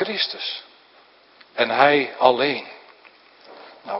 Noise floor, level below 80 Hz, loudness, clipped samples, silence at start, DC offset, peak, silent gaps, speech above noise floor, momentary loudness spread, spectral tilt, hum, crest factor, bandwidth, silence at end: -53 dBFS; -76 dBFS; -20 LUFS; under 0.1%; 0 s; under 0.1%; 0 dBFS; none; 33 dB; 19 LU; -6.5 dB/octave; none; 24 dB; 5.8 kHz; 0 s